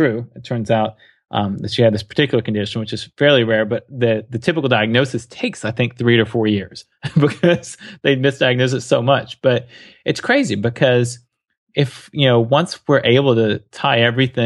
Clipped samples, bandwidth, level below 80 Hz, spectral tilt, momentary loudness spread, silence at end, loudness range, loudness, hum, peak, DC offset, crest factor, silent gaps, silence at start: under 0.1%; 11.5 kHz; -56 dBFS; -6 dB/octave; 10 LU; 0 s; 2 LU; -17 LUFS; none; -2 dBFS; under 0.1%; 16 dB; 11.58-11.67 s; 0 s